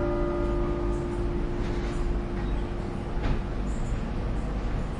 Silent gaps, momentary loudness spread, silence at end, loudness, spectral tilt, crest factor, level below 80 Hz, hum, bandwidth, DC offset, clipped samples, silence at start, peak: none; 4 LU; 0 s; -31 LUFS; -7.5 dB/octave; 12 dB; -30 dBFS; none; 10 kHz; under 0.1%; under 0.1%; 0 s; -14 dBFS